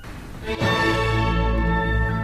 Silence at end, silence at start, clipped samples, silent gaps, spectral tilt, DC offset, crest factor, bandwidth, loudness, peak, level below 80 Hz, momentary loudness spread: 0 s; 0 s; under 0.1%; none; -6 dB/octave; under 0.1%; 12 dB; 14 kHz; -22 LUFS; -10 dBFS; -26 dBFS; 11 LU